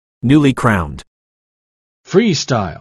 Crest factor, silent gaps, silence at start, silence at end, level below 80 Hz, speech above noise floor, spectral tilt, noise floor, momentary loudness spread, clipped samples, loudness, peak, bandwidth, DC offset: 16 dB; 1.07-2.04 s; 0.25 s; 0.05 s; -40 dBFS; over 76 dB; -6 dB/octave; under -90 dBFS; 10 LU; under 0.1%; -14 LUFS; 0 dBFS; 12.5 kHz; under 0.1%